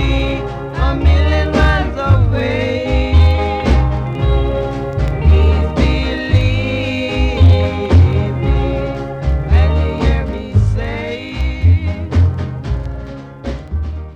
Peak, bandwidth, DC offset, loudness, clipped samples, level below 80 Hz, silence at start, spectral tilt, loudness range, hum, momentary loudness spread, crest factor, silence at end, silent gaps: -2 dBFS; 7.4 kHz; under 0.1%; -15 LUFS; under 0.1%; -18 dBFS; 0 s; -8 dB/octave; 3 LU; none; 11 LU; 10 dB; 0 s; none